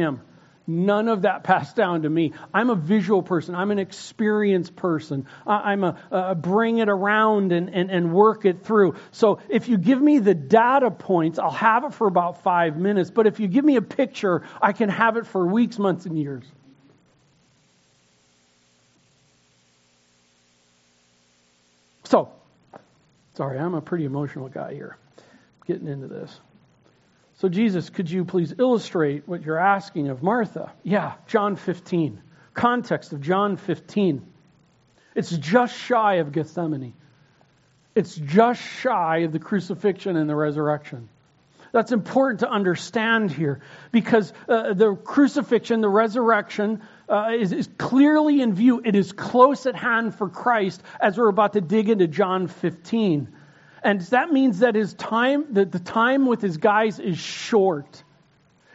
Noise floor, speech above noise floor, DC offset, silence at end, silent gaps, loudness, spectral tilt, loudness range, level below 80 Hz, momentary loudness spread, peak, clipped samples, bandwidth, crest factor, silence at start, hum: -62 dBFS; 41 dB; under 0.1%; 0.8 s; none; -22 LUFS; -5.5 dB/octave; 9 LU; -70 dBFS; 10 LU; -2 dBFS; under 0.1%; 8 kHz; 20 dB; 0 s; none